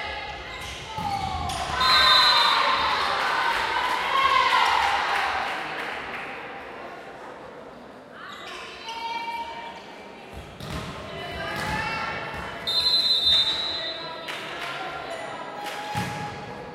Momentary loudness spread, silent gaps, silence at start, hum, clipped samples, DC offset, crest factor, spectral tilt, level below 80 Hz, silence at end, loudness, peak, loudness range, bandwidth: 22 LU; none; 0 s; none; under 0.1%; under 0.1%; 20 dB; -2 dB/octave; -50 dBFS; 0 s; -23 LUFS; -6 dBFS; 16 LU; 16.5 kHz